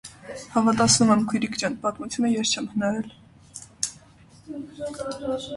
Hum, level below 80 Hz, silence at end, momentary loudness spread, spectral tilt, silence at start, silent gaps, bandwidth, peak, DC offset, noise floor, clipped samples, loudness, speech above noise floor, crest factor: none; -56 dBFS; 0 s; 21 LU; -3.5 dB/octave; 0.05 s; none; 11.5 kHz; -4 dBFS; under 0.1%; -52 dBFS; under 0.1%; -24 LUFS; 28 dB; 20 dB